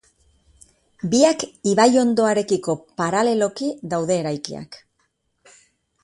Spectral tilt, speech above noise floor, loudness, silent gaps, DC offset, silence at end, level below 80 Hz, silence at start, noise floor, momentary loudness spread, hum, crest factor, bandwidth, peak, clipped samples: -4.5 dB/octave; 50 dB; -20 LUFS; none; under 0.1%; 1.3 s; -60 dBFS; 1.05 s; -69 dBFS; 14 LU; none; 20 dB; 11.5 kHz; -2 dBFS; under 0.1%